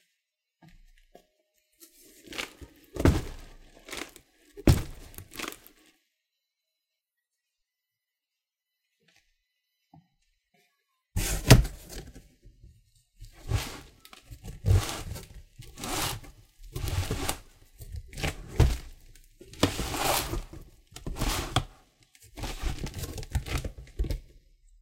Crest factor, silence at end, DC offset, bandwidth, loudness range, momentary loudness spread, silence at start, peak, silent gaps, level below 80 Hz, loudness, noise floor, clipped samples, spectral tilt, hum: 32 dB; 0.55 s; under 0.1%; 17 kHz; 7 LU; 23 LU; 0.75 s; 0 dBFS; none; -38 dBFS; -30 LUFS; -88 dBFS; under 0.1%; -4.5 dB/octave; none